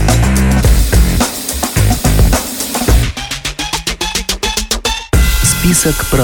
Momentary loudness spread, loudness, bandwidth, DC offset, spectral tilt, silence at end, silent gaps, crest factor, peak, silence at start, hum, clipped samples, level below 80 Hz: 6 LU; -13 LUFS; over 20 kHz; under 0.1%; -4 dB/octave; 0 s; none; 12 dB; 0 dBFS; 0 s; none; under 0.1%; -16 dBFS